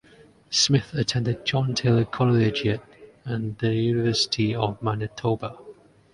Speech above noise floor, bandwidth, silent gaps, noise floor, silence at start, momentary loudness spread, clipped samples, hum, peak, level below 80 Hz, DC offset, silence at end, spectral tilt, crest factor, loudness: 30 dB; 11 kHz; none; -53 dBFS; 0.5 s; 9 LU; under 0.1%; none; -6 dBFS; -52 dBFS; under 0.1%; 0.4 s; -5 dB/octave; 18 dB; -24 LUFS